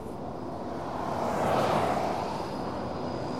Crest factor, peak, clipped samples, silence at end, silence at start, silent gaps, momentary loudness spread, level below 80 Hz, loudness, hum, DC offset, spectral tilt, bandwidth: 16 dB; -14 dBFS; under 0.1%; 0 s; 0 s; none; 11 LU; -54 dBFS; -31 LUFS; none; 0.5%; -6 dB/octave; 16 kHz